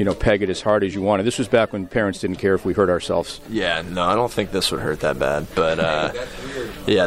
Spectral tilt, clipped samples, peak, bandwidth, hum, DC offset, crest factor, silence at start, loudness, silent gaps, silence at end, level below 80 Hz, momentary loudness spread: -5 dB/octave; under 0.1%; -4 dBFS; 16 kHz; none; under 0.1%; 16 dB; 0 s; -21 LUFS; none; 0 s; -40 dBFS; 6 LU